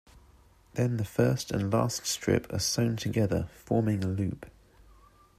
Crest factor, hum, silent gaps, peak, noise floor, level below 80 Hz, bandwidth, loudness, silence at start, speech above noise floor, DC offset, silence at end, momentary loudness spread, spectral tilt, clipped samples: 20 dB; none; none; -10 dBFS; -59 dBFS; -54 dBFS; 15 kHz; -29 LUFS; 0.75 s; 30 dB; under 0.1%; 0.9 s; 6 LU; -5.5 dB/octave; under 0.1%